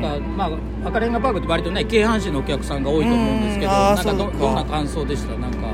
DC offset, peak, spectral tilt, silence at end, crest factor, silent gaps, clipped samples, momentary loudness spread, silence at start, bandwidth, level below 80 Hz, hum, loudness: under 0.1%; -4 dBFS; -6 dB/octave; 0 s; 16 dB; none; under 0.1%; 7 LU; 0 s; 15 kHz; -28 dBFS; none; -21 LUFS